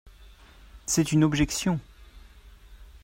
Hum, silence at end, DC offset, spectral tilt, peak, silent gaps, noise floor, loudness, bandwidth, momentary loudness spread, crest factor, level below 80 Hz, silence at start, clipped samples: none; 0.05 s; under 0.1%; -4.5 dB/octave; -10 dBFS; none; -51 dBFS; -25 LUFS; 16 kHz; 10 LU; 18 dB; -46 dBFS; 0.05 s; under 0.1%